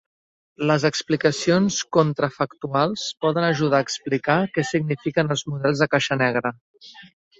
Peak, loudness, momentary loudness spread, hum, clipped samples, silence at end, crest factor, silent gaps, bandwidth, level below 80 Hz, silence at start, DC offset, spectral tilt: -4 dBFS; -22 LUFS; 4 LU; none; under 0.1%; 0.35 s; 18 dB; 6.61-6.74 s; 8 kHz; -60 dBFS; 0.6 s; under 0.1%; -5 dB/octave